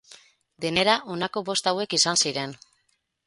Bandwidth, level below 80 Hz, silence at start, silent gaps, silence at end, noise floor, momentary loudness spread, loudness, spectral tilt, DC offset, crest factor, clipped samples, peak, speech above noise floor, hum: 11.5 kHz; -64 dBFS; 0.1 s; none; 0.7 s; -72 dBFS; 11 LU; -23 LUFS; -2 dB/octave; under 0.1%; 22 dB; under 0.1%; -4 dBFS; 47 dB; none